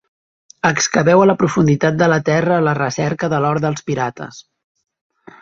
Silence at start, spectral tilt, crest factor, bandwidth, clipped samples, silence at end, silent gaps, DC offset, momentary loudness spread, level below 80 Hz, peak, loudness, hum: 0.65 s; -5.5 dB/octave; 16 dB; 7.8 kHz; under 0.1%; 1 s; none; under 0.1%; 9 LU; -52 dBFS; -2 dBFS; -16 LUFS; none